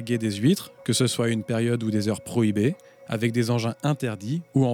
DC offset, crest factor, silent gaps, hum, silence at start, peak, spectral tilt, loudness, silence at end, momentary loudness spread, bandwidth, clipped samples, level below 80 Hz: under 0.1%; 16 dB; none; none; 0 s; -8 dBFS; -5.5 dB/octave; -25 LUFS; 0 s; 5 LU; 18 kHz; under 0.1%; -64 dBFS